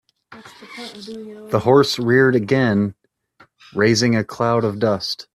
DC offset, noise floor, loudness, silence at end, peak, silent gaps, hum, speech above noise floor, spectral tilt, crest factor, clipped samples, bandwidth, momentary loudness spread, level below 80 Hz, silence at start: under 0.1%; -55 dBFS; -17 LUFS; 0.1 s; -2 dBFS; none; none; 36 dB; -5.5 dB/octave; 18 dB; under 0.1%; 14 kHz; 19 LU; -56 dBFS; 0.3 s